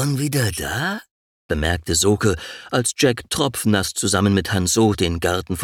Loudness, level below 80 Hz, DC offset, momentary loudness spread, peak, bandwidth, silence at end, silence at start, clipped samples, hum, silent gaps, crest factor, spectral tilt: -20 LUFS; -38 dBFS; under 0.1%; 7 LU; -4 dBFS; 19 kHz; 0 s; 0 s; under 0.1%; none; 1.11-1.49 s; 16 dB; -4 dB/octave